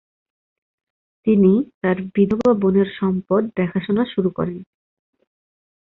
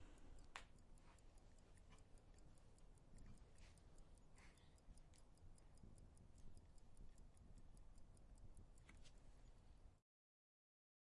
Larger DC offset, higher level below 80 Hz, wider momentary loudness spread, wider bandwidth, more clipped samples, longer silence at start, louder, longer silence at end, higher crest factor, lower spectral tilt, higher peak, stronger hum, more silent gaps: neither; first, -54 dBFS vs -66 dBFS; about the same, 8 LU vs 8 LU; second, 4.2 kHz vs 11 kHz; neither; first, 1.25 s vs 0 s; first, -19 LUFS vs -68 LUFS; first, 1.3 s vs 1 s; second, 16 dB vs 30 dB; first, -9.5 dB/octave vs -4.5 dB/octave; first, -4 dBFS vs -32 dBFS; neither; first, 1.74-1.81 s vs none